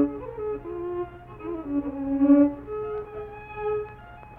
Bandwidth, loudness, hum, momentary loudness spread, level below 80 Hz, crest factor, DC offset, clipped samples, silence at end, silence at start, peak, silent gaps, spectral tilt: 3.5 kHz; -26 LUFS; none; 19 LU; -50 dBFS; 18 dB; under 0.1%; under 0.1%; 0 s; 0 s; -8 dBFS; none; -10.5 dB/octave